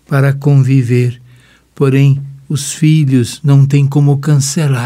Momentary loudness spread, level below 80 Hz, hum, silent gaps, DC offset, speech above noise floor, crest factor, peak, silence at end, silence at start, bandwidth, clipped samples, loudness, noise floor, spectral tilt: 9 LU; -54 dBFS; none; none; under 0.1%; 34 dB; 10 dB; 0 dBFS; 0 s; 0.1 s; 13.5 kHz; under 0.1%; -11 LUFS; -44 dBFS; -6.5 dB/octave